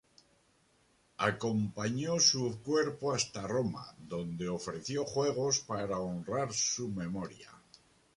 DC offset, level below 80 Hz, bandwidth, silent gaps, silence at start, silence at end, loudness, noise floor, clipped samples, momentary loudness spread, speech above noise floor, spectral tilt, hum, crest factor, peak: under 0.1%; -64 dBFS; 11.5 kHz; none; 1.2 s; 0.6 s; -33 LUFS; -70 dBFS; under 0.1%; 12 LU; 36 dB; -3.5 dB/octave; none; 22 dB; -14 dBFS